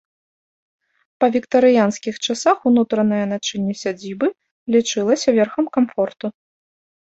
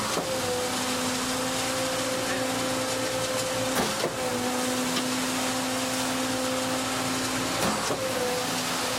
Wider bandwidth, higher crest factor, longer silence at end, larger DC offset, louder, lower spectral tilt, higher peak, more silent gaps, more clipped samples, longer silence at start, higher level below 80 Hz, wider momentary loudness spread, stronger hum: second, 8.2 kHz vs 16.5 kHz; about the same, 16 dB vs 14 dB; first, 0.75 s vs 0 s; neither; first, -19 LUFS vs -27 LUFS; first, -4.5 dB/octave vs -2.5 dB/octave; first, -2 dBFS vs -14 dBFS; first, 4.51-4.66 s vs none; neither; first, 1.2 s vs 0 s; second, -62 dBFS vs -56 dBFS; first, 9 LU vs 1 LU; neither